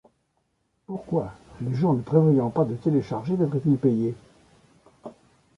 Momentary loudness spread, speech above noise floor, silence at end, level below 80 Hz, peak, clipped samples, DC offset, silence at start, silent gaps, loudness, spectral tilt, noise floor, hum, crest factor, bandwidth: 22 LU; 49 dB; 0.45 s; -58 dBFS; -6 dBFS; under 0.1%; under 0.1%; 0.9 s; none; -24 LUFS; -10.5 dB/octave; -72 dBFS; none; 18 dB; 7 kHz